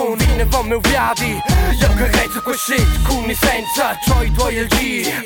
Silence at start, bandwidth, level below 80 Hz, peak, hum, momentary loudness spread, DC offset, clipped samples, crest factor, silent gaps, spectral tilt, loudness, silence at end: 0 s; 18.5 kHz; -20 dBFS; -4 dBFS; none; 3 LU; under 0.1%; under 0.1%; 12 dB; none; -4 dB/octave; -16 LUFS; 0 s